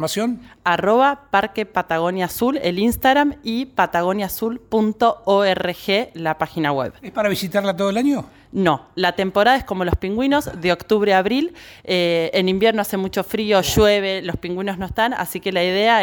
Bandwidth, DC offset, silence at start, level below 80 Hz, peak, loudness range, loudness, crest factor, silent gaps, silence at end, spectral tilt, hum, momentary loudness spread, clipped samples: over 20 kHz; under 0.1%; 0 s; -42 dBFS; -2 dBFS; 2 LU; -19 LUFS; 16 dB; none; 0 s; -5 dB/octave; none; 8 LU; under 0.1%